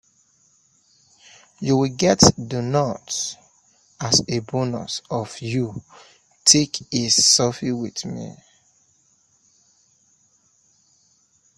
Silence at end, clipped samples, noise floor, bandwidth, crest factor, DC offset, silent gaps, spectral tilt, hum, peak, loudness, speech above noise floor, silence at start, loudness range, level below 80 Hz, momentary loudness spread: 3.25 s; under 0.1%; -62 dBFS; 14.5 kHz; 24 dB; under 0.1%; none; -3.5 dB/octave; none; 0 dBFS; -19 LUFS; 41 dB; 1.6 s; 6 LU; -54 dBFS; 16 LU